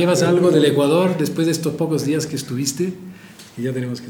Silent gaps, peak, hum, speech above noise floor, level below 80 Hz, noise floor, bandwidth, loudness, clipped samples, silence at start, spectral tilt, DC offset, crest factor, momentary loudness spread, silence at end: none; -2 dBFS; none; 22 dB; -64 dBFS; -40 dBFS; 19 kHz; -19 LUFS; under 0.1%; 0 s; -5.5 dB/octave; under 0.1%; 16 dB; 12 LU; 0 s